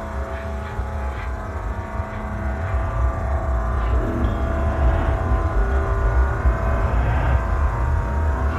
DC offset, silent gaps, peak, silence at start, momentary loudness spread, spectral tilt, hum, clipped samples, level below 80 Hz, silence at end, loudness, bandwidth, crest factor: under 0.1%; none; -8 dBFS; 0 s; 8 LU; -8 dB/octave; none; under 0.1%; -22 dBFS; 0 s; -23 LUFS; 7.8 kHz; 14 dB